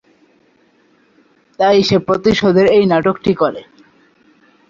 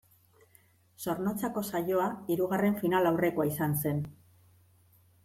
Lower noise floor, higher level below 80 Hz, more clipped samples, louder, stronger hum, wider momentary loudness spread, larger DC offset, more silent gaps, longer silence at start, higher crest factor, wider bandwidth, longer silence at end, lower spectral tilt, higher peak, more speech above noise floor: second, -54 dBFS vs -64 dBFS; first, -48 dBFS vs -68 dBFS; neither; first, -13 LUFS vs -30 LUFS; neither; about the same, 6 LU vs 8 LU; neither; neither; first, 1.6 s vs 1 s; about the same, 16 dB vs 16 dB; second, 7.4 kHz vs 16.5 kHz; about the same, 1.1 s vs 1.15 s; about the same, -6.5 dB/octave vs -6.5 dB/octave; first, 0 dBFS vs -14 dBFS; first, 42 dB vs 34 dB